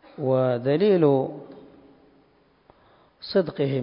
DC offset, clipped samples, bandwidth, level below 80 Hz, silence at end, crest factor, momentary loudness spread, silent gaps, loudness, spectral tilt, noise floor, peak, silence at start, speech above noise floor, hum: under 0.1%; under 0.1%; 5.4 kHz; -66 dBFS; 0 s; 18 dB; 15 LU; none; -23 LUFS; -11.5 dB/octave; -60 dBFS; -8 dBFS; 0.2 s; 39 dB; none